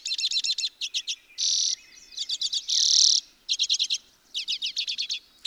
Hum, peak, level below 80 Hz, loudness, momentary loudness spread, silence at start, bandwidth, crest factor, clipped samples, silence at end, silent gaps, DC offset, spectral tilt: none; -6 dBFS; -74 dBFS; -24 LUFS; 14 LU; 0.05 s; 17 kHz; 22 dB; under 0.1%; 0.25 s; none; under 0.1%; 6 dB/octave